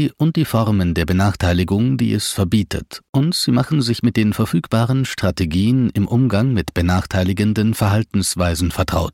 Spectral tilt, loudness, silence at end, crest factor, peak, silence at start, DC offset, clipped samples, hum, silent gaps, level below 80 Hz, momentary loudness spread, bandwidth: -6 dB/octave; -18 LUFS; 0.05 s; 12 dB; -4 dBFS; 0 s; under 0.1%; under 0.1%; none; 3.09-3.13 s; -36 dBFS; 3 LU; 16.5 kHz